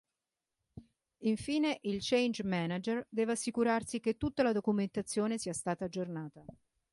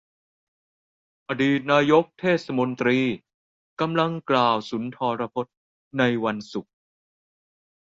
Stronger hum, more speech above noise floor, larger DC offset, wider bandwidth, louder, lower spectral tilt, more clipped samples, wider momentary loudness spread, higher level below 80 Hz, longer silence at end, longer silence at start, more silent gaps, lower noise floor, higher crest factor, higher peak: neither; second, 56 dB vs over 67 dB; neither; first, 11.5 kHz vs 7.6 kHz; second, -34 LUFS vs -23 LUFS; second, -5 dB/octave vs -6.5 dB/octave; neither; second, 7 LU vs 13 LU; about the same, -64 dBFS vs -66 dBFS; second, 0.4 s vs 1.3 s; second, 0.75 s vs 1.3 s; second, none vs 3.34-3.77 s, 5.57-5.91 s; about the same, -90 dBFS vs under -90 dBFS; about the same, 18 dB vs 20 dB; second, -16 dBFS vs -4 dBFS